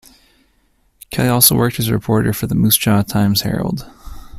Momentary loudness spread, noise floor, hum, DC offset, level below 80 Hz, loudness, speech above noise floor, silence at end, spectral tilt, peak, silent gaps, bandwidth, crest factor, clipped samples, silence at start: 11 LU; -59 dBFS; none; under 0.1%; -40 dBFS; -15 LUFS; 44 dB; 0 s; -4.5 dB/octave; 0 dBFS; none; 16 kHz; 16 dB; under 0.1%; 1.1 s